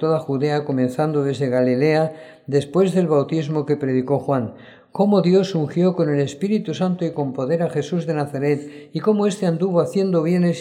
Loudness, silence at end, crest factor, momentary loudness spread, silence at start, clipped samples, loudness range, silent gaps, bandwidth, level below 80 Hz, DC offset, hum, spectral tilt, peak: -20 LUFS; 0 s; 14 dB; 6 LU; 0 s; under 0.1%; 2 LU; none; 11 kHz; -66 dBFS; under 0.1%; none; -7.5 dB/octave; -4 dBFS